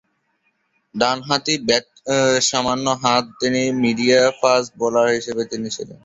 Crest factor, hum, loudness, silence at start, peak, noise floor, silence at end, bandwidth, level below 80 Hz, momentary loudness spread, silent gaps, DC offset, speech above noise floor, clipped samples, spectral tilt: 20 dB; none; -18 LUFS; 0.95 s; 0 dBFS; -67 dBFS; 0.1 s; 8 kHz; -58 dBFS; 9 LU; none; under 0.1%; 49 dB; under 0.1%; -3 dB/octave